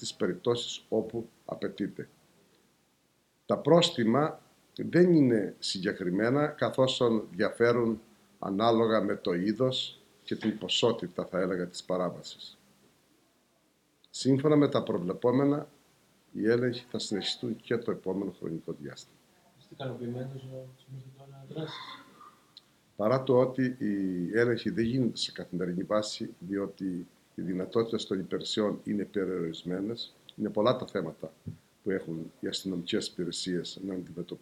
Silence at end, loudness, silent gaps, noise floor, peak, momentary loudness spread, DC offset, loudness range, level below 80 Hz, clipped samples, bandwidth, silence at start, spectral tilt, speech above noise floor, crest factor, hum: 0.05 s; -30 LUFS; none; -70 dBFS; -10 dBFS; 17 LU; under 0.1%; 10 LU; -70 dBFS; under 0.1%; 14 kHz; 0 s; -5.5 dB/octave; 41 dB; 22 dB; none